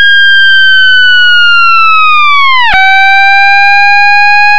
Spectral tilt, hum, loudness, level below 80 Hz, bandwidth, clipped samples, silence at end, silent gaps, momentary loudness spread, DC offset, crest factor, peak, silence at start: 0.5 dB/octave; none; -3 LUFS; -36 dBFS; 9.2 kHz; 4%; 0 s; none; 2 LU; under 0.1%; 4 dB; 0 dBFS; 0 s